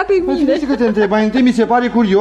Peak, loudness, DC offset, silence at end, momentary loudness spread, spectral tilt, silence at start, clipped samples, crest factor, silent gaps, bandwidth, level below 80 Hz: -2 dBFS; -14 LUFS; under 0.1%; 0 s; 3 LU; -6.5 dB/octave; 0 s; under 0.1%; 10 dB; none; 9 kHz; -42 dBFS